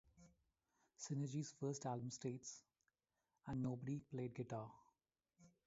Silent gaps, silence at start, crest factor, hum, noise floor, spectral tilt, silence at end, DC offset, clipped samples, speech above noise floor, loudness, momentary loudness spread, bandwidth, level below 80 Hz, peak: none; 0.15 s; 18 dB; none; under -90 dBFS; -7.5 dB/octave; 0.2 s; under 0.1%; under 0.1%; over 43 dB; -48 LUFS; 10 LU; 7.6 kHz; -78 dBFS; -32 dBFS